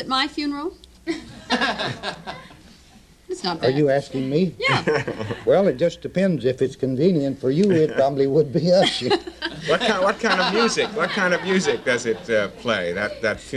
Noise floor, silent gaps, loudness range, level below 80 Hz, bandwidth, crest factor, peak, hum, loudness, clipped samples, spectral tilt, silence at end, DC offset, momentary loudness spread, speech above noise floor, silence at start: -50 dBFS; none; 5 LU; -52 dBFS; 12.5 kHz; 16 dB; -6 dBFS; none; -21 LUFS; under 0.1%; -5 dB/octave; 0 s; under 0.1%; 12 LU; 29 dB; 0 s